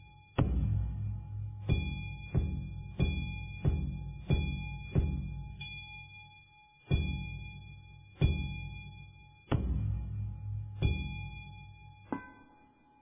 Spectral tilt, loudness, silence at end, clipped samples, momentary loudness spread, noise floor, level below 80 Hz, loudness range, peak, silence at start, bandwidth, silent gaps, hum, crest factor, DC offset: -6.5 dB/octave; -36 LUFS; 0.55 s; under 0.1%; 18 LU; -63 dBFS; -40 dBFS; 3 LU; -14 dBFS; 0 s; 3.8 kHz; none; none; 22 dB; under 0.1%